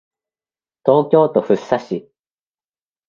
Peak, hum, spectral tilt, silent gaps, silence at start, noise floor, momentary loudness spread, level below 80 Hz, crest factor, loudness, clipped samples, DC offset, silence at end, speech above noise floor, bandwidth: 0 dBFS; none; -8 dB/octave; none; 0.85 s; under -90 dBFS; 12 LU; -62 dBFS; 18 dB; -16 LUFS; under 0.1%; under 0.1%; 1.1 s; over 75 dB; 7.2 kHz